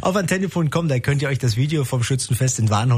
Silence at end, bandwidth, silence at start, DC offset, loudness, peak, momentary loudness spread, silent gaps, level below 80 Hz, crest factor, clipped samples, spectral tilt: 0 s; 15.5 kHz; 0 s; under 0.1%; -20 LUFS; -6 dBFS; 2 LU; none; -48 dBFS; 14 dB; under 0.1%; -5.5 dB/octave